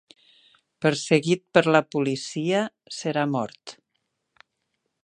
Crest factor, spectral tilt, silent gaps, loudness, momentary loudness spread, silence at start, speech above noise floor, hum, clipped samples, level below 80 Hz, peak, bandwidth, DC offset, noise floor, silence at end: 22 dB; -5 dB/octave; none; -24 LUFS; 12 LU; 0.8 s; 54 dB; none; under 0.1%; -72 dBFS; -4 dBFS; 11 kHz; under 0.1%; -78 dBFS; 1.3 s